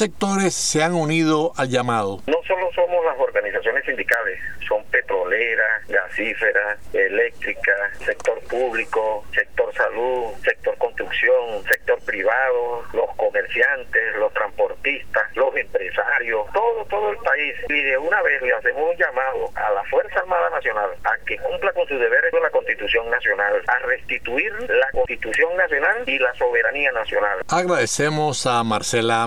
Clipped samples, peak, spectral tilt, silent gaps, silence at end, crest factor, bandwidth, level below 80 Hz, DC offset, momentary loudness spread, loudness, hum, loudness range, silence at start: under 0.1%; -4 dBFS; -3.5 dB/octave; none; 0 s; 16 dB; over 20 kHz; -48 dBFS; 1%; 5 LU; -20 LUFS; none; 2 LU; 0 s